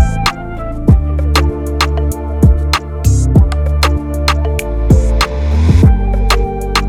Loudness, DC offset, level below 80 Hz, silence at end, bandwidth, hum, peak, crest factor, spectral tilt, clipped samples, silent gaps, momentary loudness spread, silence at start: -13 LUFS; under 0.1%; -14 dBFS; 0 s; 15 kHz; none; 0 dBFS; 12 dB; -6 dB/octave; 0.4%; none; 6 LU; 0 s